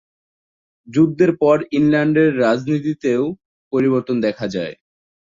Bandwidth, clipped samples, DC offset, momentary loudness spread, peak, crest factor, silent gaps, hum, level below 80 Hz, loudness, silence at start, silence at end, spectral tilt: 7.6 kHz; under 0.1%; under 0.1%; 10 LU; -2 dBFS; 16 dB; 3.45-3.71 s; none; -58 dBFS; -18 LUFS; 0.9 s; 0.65 s; -7.5 dB/octave